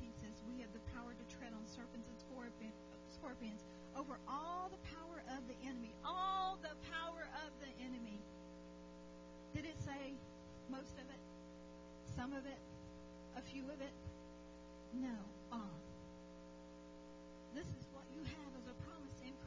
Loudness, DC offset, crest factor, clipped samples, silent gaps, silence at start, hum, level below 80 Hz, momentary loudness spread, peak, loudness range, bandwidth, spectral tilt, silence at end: -51 LUFS; under 0.1%; 18 dB; under 0.1%; none; 0 s; 60 Hz at -65 dBFS; -64 dBFS; 11 LU; -32 dBFS; 7 LU; 7.6 kHz; -5.5 dB/octave; 0 s